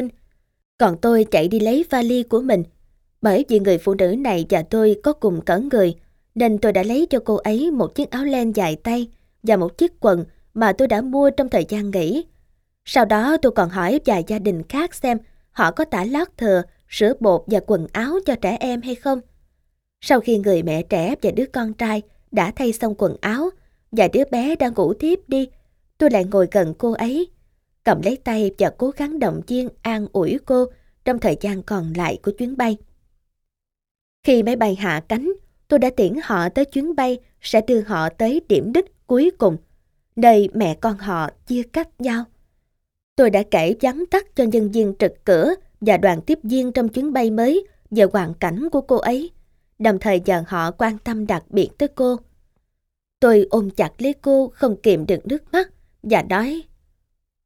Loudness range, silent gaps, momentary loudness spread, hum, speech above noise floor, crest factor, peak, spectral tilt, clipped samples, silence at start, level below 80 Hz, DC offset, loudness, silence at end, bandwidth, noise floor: 3 LU; 0.65-0.78 s, 33.91-33.95 s, 34.01-34.23 s, 43.03-43.16 s; 8 LU; none; 62 dB; 20 dB; 0 dBFS; -6.5 dB/octave; under 0.1%; 0 s; -46 dBFS; under 0.1%; -19 LUFS; 0.85 s; 17 kHz; -80 dBFS